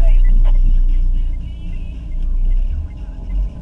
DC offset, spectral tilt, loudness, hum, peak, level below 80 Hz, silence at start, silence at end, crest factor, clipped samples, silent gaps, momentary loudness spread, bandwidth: under 0.1%; -8.5 dB/octave; -22 LUFS; none; -4 dBFS; -14 dBFS; 0 s; 0 s; 10 dB; under 0.1%; none; 12 LU; 3.1 kHz